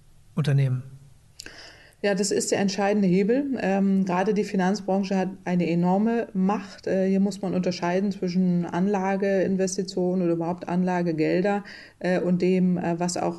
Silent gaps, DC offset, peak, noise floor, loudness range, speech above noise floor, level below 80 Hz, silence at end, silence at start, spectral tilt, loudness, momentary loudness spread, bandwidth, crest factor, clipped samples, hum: none; under 0.1%; -12 dBFS; -47 dBFS; 2 LU; 24 dB; -60 dBFS; 0 s; 0.35 s; -6.5 dB/octave; -24 LUFS; 6 LU; 12 kHz; 12 dB; under 0.1%; none